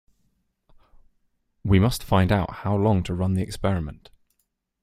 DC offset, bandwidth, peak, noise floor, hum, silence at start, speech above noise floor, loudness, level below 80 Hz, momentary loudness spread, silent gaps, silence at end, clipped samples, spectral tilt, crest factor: under 0.1%; 15 kHz; -4 dBFS; -75 dBFS; none; 1.65 s; 53 dB; -23 LUFS; -42 dBFS; 7 LU; none; 0.9 s; under 0.1%; -7 dB/octave; 20 dB